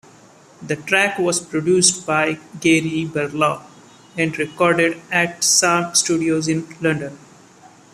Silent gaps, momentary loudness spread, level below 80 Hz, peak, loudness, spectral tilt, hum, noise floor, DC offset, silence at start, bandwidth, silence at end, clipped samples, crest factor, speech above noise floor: none; 9 LU; -60 dBFS; 0 dBFS; -18 LUFS; -3 dB/octave; none; -47 dBFS; under 0.1%; 0.6 s; 14.5 kHz; 0.75 s; under 0.1%; 20 dB; 28 dB